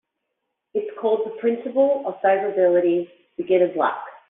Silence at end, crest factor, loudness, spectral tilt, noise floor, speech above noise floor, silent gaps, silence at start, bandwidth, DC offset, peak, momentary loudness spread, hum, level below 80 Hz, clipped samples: 0.1 s; 14 dB; -21 LUFS; -4.5 dB/octave; -79 dBFS; 58 dB; none; 0.75 s; 3.9 kHz; under 0.1%; -6 dBFS; 10 LU; none; -72 dBFS; under 0.1%